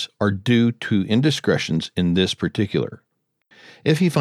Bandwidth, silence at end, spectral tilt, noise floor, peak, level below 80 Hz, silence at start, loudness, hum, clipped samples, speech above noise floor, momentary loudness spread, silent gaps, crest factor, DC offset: 13.5 kHz; 0 s; -6 dB/octave; -61 dBFS; -4 dBFS; -54 dBFS; 0 s; -21 LUFS; none; under 0.1%; 42 dB; 5 LU; none; 16 dB; under 0.1%